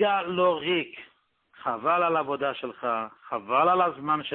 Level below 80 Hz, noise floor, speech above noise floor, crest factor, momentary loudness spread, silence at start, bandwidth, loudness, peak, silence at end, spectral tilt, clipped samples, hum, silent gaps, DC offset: -70 dBFS; -60 dBFS; 34 dB; 16 dB; 12 LU; 0 s; 4.3 kHz; -26 LUFS; -10 dBFS; 0 s; -9 dB/octave; under 0.1%; none; none; under 0.1%